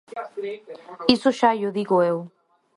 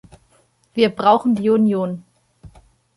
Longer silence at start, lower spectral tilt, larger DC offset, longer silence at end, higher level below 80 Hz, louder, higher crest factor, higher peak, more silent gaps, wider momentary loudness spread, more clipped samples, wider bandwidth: second, 0.15 s vs 0.75 s; second, -5.5 dB/octave vs -7.5 dB/octave; neither; about the same, 0.5 s vs 0.5 s; about the same, -60 dBFS vs -56 dBFS; second, -22 LUFS vs -18 LUFS; about the same, 22 dB vs 18 dB; about the same, -2 dBFS vs -2 dBFS; neither; first, 18 LU vs 13 LU; neither; about the same, 11.5 kHz vs 11.5 kHz